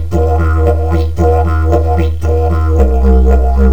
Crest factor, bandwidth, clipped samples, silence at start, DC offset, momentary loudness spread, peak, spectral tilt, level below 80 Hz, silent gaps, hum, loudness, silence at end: 10 dB; 7.2 kHz; under 0.1%; 0 s; 9%; 4 LU; 0 dBFS; -9 dB/octave; -12 dBFS; none; none; -12 LUFS; 0 s